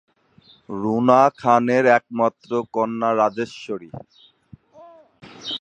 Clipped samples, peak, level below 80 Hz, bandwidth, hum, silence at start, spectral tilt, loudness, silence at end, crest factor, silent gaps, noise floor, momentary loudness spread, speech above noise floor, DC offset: under 0.1%; -2 dBFS; -64 dBFS; 8.8 kHz; none; 0.7 s; -6 dB/octave; -19 LUFS; 0.05 s; 20 dB; none; -54 dBFS; 17 LU; 35 dB; under 0.1%